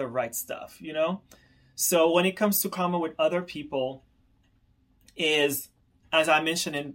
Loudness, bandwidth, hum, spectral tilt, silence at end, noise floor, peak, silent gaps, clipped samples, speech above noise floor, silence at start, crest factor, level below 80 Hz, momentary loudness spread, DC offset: -26 LUFS; 16.5 kHz; none; -3 dB/octave; 0 s; -65 dBFS; -10 dBFS; none; under 0.1%; 38 dB; 0 s; 18 dB; -66 dBFS; 16 LU; under 0.1%